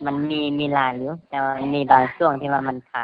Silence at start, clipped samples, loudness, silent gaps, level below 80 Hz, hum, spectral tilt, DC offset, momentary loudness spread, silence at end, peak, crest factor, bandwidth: 0 s; under 0.1%; -21 LUFS; none; -58 dBFS; none; -8.5 dB/octave; under 0.1%; 10 LU; 0 s; 0 dBFS; 20 dB; 5 kHz